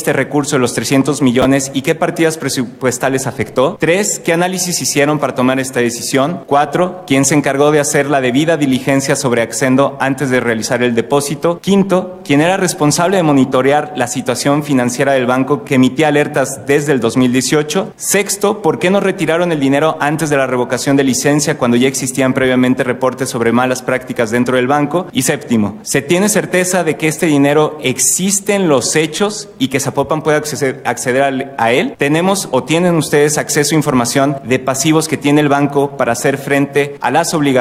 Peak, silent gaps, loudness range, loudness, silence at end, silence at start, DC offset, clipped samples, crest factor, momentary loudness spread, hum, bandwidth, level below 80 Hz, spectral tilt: 0 dBFS; none; 2 LU; -13 LUFS; 0 s; 0 s; under 0.1%; under 0.1%; 12 dB; 5 LU; none; 16 kHz; -50 dBFS; -4.5 dB/octave